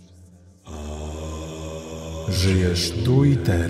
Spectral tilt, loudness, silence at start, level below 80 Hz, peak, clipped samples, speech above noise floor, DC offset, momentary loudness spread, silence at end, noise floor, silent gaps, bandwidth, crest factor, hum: -6 dB/octave; -23 LUFS; 0.2 s; -38 dBFS; -6 dBFS; under 0.1%; 30 dB; under 0.1%; 16 LU; 0 s; -48 dBFS; none; 15 kHz; 16 dB; none